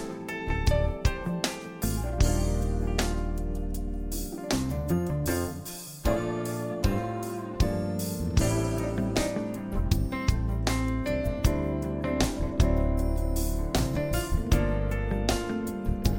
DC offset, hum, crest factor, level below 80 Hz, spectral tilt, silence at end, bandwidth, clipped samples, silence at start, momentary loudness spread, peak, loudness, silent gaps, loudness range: under 0.1%; none; 20 dB; -32 dBFS; -5.5 dB/octave; 0 s; 17 kHz; under 0.1%; 0 s; 7 LU; -8 dBFS; -29 LUFS; none; 2 LU